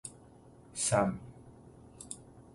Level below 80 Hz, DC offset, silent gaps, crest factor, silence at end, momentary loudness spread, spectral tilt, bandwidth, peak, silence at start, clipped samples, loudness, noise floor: -62 dBFS; under 0.1%; none; 24 dB; 0.15 s; 26 LU; -4 dB/octave; 11.5 kHz; -14 dBFS; 0.05 s; under 0.1%; -34 LUFS; -57 dBFS